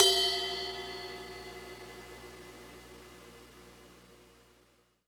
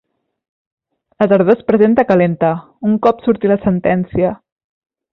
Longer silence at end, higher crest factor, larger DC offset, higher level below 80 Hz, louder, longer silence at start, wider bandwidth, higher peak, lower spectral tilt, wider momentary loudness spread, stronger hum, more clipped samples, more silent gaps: about the same, 0.9 s vs 0.8 s; first, 30 dB vs 14 dB; neither; second, -62 dBFS vs -46 dBFS; second, -33 LUFS vs -14 LUFS; second, 0 s vs 1.2 s; first, over 20 kHz vs 5.6 kHz; second, -6 dBFS vs 0 dBFS; second, -1 dB/octave vs -10 dB/octave; first, 25 LU vs 7 LU; neither; neither; neither